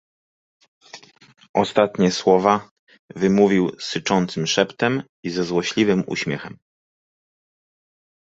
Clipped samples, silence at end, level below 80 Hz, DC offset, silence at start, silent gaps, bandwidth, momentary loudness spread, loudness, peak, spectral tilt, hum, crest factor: under 0.1%; 1.85 s; -58 dBFS; under 0.1%; 0.95 s; 1.49-1.54 s, 2.71-2.87 s, 2.99-3.08 s, 5.09-5.23 s; 8 kHz; 10 LU; -20 LUFS; -2 dBFS; -5 dB/octave; none; 20 dB